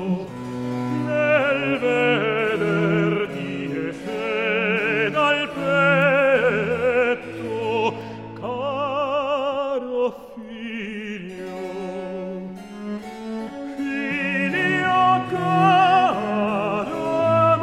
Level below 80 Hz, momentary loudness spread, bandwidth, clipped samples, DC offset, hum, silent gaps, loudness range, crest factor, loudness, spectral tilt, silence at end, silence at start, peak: -58 dBFS; 15 LU; 13.5 kHz; under 0.1%; under 0.1%; none; none; 10 LU; 16 dB; -21 LUFS; -6.5 dB/octave; 0 s; 0 s; -6 dBFS